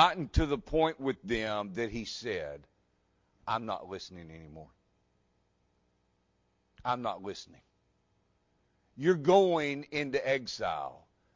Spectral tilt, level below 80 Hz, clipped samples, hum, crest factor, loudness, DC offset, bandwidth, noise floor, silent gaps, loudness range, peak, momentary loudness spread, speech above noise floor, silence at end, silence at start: -5.5 dB/octave; -48 dBFS; under 0.1%; 60 Hz at -70 dBFS; 26 dB; -32 LUFS; under 0.1%; 7.6 kHz; -74 dBFS; none; 12 LU; -8 dBFS; 20 LU; 43 dB; 0.4 s; 0 s